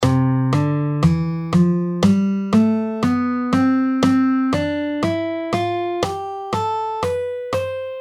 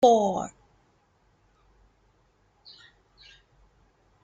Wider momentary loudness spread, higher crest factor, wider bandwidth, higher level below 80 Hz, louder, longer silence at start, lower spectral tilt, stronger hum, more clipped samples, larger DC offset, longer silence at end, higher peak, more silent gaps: second, 7 LU vs 31 LU; second, 16 dB vs 24 dB; first, 13 kHz vs 9 kHz; first, -46 dBFS vs -64 dBFS; first, -19 LUFS vs -25 LUFS; about the same, 0 s vs 0 s; first, -7.5 dB/octave vs -5 dB/octave; neither; neither; neither; second, 0 s vs 3.75 s; first, -2 dBFS vs -6 dBFS; neither